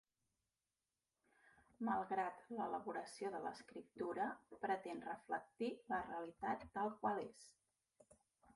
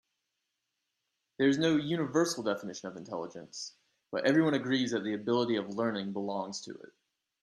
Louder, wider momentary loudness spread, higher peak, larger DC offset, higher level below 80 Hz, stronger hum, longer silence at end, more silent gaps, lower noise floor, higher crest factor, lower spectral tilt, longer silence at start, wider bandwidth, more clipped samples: second, -46 LUFS vs -31 LUFS; second, 7 LU vs 15 LU; second, -28 dBFS vs -14 dBFS; neither; about the same, -80 dBFS vs -76 dBFS; neither; first, 1.05 s vs 0.55 s; neither; first, under -90 dBFS vs -84 dBFS; about the same, 20 dB vs 20 dB; about the same, -5.5 dB/octave vs -5 dB/octave; first, 1.8 s vs 1.4 s; second, 11.5 kHz vs 13 kHz; neither